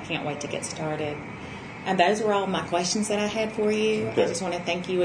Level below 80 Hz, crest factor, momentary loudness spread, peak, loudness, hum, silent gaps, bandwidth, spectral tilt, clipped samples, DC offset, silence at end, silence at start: -58 dBFS; 20 dB; 11 LU; -6 dBFS; -26 LUFS; none; none; 10.5 kHz; -4 dB/octave; under 0.1%; under 0.1%; 0 s; 0 s